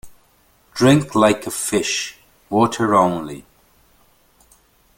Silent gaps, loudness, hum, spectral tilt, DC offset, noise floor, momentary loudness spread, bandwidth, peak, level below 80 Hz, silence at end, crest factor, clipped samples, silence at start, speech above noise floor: none; -18 LUFS; none; -4.5 dB/octave; under 0.1%; -57 dBFS; 16 LU; 17 kHz; -2 dBFS; -54 dBFS; 1.55 s; 18 dB; under 0.1%; 0.05 s; 40 dB